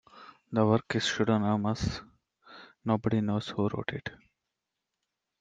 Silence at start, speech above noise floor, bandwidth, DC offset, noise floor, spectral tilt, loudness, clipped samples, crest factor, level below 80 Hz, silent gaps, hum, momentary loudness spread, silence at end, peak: 0.15 s; 58 dB; 9 kHz; under 0.1%; -86 dBFS; -6 dB/octave; -30 LUFS; under 0.1%; 20 dB; -56 dBFS; none; none; 12 LU; 1.25 s; -12 dBFS